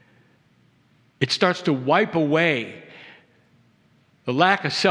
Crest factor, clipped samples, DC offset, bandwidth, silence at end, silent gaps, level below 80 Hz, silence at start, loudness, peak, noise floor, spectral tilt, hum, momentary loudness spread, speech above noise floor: 22 dB; under 0.1%; under 0.1%; 11 kHz; 0 s; none; -72 dBFS; 1.2 s; -21 LUFS; -2 dBFS; -60 dBFS; -5 dB/octave; none; 16 LU; 40 dB